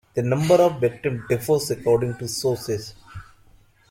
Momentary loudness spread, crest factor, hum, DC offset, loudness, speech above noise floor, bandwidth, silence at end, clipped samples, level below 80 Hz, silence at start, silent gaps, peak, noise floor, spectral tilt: 20 LU; 18 dB; none; under 0.1%; -22 LUFS; 33 dB; 16.5 kHz; 0.7 s; under 0.1%; -52 dBFS; 0.15 s; none; -6 dBFS; -54 dBFS; -5.5 dB/octave